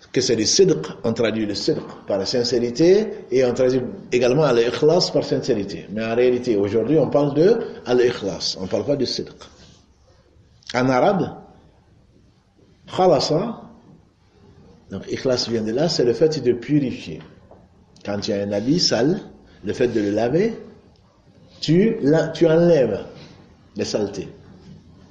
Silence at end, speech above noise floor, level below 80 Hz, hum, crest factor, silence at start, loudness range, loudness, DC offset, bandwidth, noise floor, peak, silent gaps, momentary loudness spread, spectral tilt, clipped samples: 0.35 s; 36 dB; -52 dBFS; none; 16 dB; 0.15 s; 6 LU; -20 LUFS; under 0.1%; 8.8 kHz; -55 dBFS; -4 dBFS; none; 13 LU; -5 dB/octave; under 0.1%